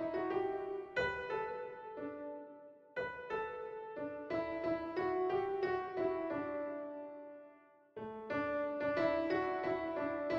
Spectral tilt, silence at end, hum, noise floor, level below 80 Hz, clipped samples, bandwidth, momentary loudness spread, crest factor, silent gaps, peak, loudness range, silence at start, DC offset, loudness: -7 dB/octave; 0 s; none; -63 dBFS; -68 dBFS; under 0.1%; 7.2 kHz; 13 LU; 16 dB; none; -24 dBFS; 4 LU; 0 s; under 0.1%; -39 LUFS